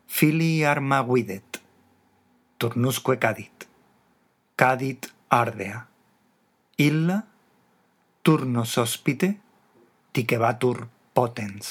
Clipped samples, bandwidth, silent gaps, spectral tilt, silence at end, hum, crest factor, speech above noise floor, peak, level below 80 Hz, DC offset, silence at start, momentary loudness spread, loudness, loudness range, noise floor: under 0.1%; 20 kHz; none; -5.5 dB/octave; 0 s; none; 24 dB; 43 dB; 0 dBFS; -76 dBFS; under 0.1%; 0.1 s; 15 LU; -24 LUFS; 3 LU; -66 dBFS